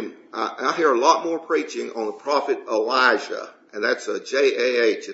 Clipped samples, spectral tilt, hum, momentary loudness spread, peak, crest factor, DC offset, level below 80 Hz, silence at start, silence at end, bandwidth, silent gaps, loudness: under 0.1%; -2 dB/octave; none; 11 LU; -2 dBFS; 20 dB; under 0.1%; -80 dBFS; 0 s; 0 s; 8 kHz; none; -21 LUFS